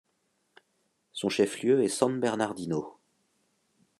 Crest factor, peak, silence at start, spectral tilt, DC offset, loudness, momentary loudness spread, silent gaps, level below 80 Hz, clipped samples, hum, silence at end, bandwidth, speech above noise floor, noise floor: 22 dB; -8 dBFS; 1.15 s; -4.5 dB/octave; under 0.1%; -28 LUFS; 10 LU; none; -74 dBFS; under 0.1%; none; 1.05 s; 13 kHz; 48 dB; -75 dBFS